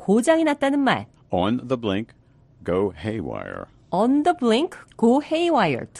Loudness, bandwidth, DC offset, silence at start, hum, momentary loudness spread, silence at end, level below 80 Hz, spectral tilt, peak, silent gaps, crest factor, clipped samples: -22 LUFS; 11.5 kHz; under 0.1%; 0 s; none; 12 LU; 0 s; -54 dBFS; -6 dB/octave; -6 dBFS; none; 16 dB; under 0.1%